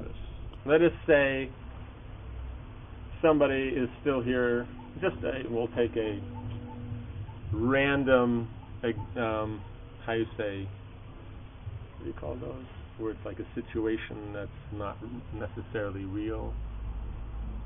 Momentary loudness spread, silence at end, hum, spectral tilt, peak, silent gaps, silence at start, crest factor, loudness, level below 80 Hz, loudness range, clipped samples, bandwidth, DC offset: 20 LU; 0 s; none; -10.5 dB/octave; -10 dBFS; none; 0 s; 20 dB; -31 LUFS; -44 dBFS; 9 LU; under 0.1%; 3.8 kHz; under 0.1%